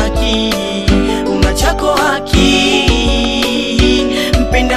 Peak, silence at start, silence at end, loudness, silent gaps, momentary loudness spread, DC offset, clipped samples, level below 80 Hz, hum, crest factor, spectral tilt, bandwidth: 0 dBFS; 0 s; 0 s; -12 LUFS; none; 4 LU; 0.9%; under 0.1%; -18 dBFS; none; 12 dB; -4.5 dB/octave; 14 kHz